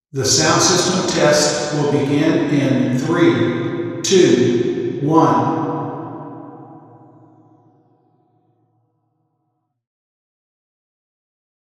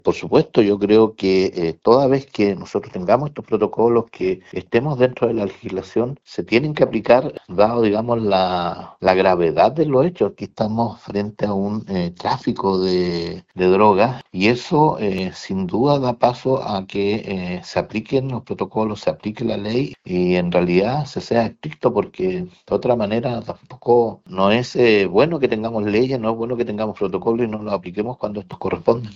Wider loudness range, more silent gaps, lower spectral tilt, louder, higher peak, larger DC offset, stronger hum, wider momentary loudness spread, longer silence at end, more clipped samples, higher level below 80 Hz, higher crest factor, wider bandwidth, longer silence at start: first, 12 LU vs 4 LU; neither; second, -4 dB/octave vs -7 dB/octave; first, -16 LUFS vs -19 LUFS; about the same, 0 dBFS vs 0 dBFS; neither; neither; first, 14 LU vs 10 LU; first, 4.9 s vs 0 s; neither; about the same, -56 dBFS vs -52 dBFS; about the same, 18 dB vs 18 dB; first, 15 kHz vs 7.6 kHz; about the same, 0.15 s vs 0.05 s